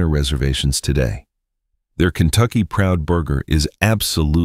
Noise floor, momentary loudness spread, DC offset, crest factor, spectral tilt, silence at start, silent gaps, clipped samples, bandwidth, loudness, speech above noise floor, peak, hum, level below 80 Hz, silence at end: -72 dBFS; 4 LU; under 0.1%; 16 dB; -5 dB/octave; 0 s; none; under 0.1%; 16 kHz; -18 LUFS; 55 dB; -2 dBFS; none; -26 dBFS; 0 s